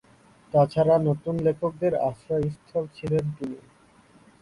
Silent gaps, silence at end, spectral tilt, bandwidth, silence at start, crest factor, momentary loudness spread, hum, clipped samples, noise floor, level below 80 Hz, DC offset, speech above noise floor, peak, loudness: none; 0.8 s; -9 dB/octave; 11 kHz; 0.55 s; 18 dB; 11 LU; none; under 0.1%; -56 dBFS; -54 dBFS; under 0.1%; 32 dB; -8 dBFS; -25 LUFS